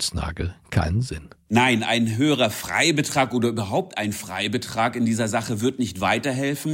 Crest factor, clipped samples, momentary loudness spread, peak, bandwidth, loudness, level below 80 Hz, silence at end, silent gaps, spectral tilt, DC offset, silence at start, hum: 18 dB; under 0.1%; 8 LU; -4 dBFS; 16.5 kHz; -23 LUFS; -42 dBFS; 0 s; none; -4.5 dB/octave; under 0.1%; 0 s; none